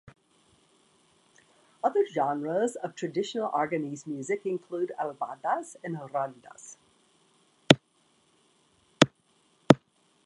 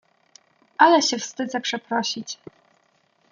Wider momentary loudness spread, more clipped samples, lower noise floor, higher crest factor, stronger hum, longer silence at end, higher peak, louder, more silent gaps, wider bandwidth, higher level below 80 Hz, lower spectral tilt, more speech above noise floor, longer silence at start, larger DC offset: second, 14 LU vs 20 LU; neither; first, -68 dBFS vs -64 dBFS; first, 30 dB vs 22 dB; neither; second, 0.5 s vs 0.95 s; about the same, 0 dBFS vs -2 dBFS; second, -28 LUFS vs -21 LUFS; neither; first, 11.5 kHz vs 7.4 kHz; first, -66 dBFS vs -76 dBFS; first, -5 dB/octave vs -2 dB/octave; second, 37 dB vs 43 dB; second, 0.05 s vs 0.8 s; neither